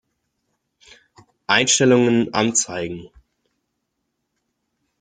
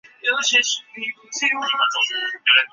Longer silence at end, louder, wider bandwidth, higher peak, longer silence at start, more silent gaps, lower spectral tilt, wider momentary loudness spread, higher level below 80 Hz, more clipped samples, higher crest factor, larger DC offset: first, 1.95 s vs 0.05 s; about the same, -17 LUFS vs -19 LUFS; first, 9.6 kHz vs 8 kHz; about the same, 0 dBFS vs -2 dBFS; first, 1.5 s vs 0.25 s; neither; first, -3 dB/octave vs 2.5 dB/octave; first, 17 LU vs 11 LU; first, -60 dBFS vs -82 dBFS; neither; about the same, 22 dB vs 18 dB; neither